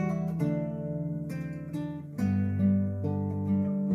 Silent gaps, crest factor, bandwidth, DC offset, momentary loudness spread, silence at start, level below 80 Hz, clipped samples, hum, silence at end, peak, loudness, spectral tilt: none; 12 dB; 11.5 kHz; under 0.1%; 9 LU; 0 s; -60 dBFS; under 0.1%; none; 0 s; -16 dBFS; -31 LUFS; -10 dB/octave